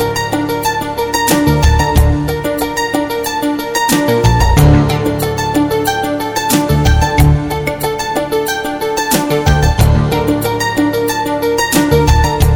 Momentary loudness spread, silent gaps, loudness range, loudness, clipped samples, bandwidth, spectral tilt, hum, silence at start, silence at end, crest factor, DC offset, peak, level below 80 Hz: 6 LU; none; 2 LU; -13 LUFS; under 0.1%; 19 kHz; -5 dB/octave; none; 0 s; 0 s; 12 dB; under 0.1%; 0 dBFS; -18 dBFS